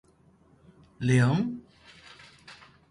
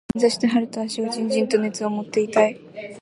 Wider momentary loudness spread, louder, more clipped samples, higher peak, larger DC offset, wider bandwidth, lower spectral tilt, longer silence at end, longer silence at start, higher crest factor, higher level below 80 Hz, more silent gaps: first, 26 LU vs 8 LU; second, -26 LUFS vs -22 LUFS; neither; second, -10 dBFS vs -4 dBFS; neither; about the same, 11.5 kHz vs 11.5 kHz; first, -7 dB/octave vs -4.5 dB/octave; first, 0.4 s vs 0 s; first, 1 s vs 0.15 s; about the same, 20 dB vs 18 dB; about the same, -60 dBFS vs -58 dBFS; neither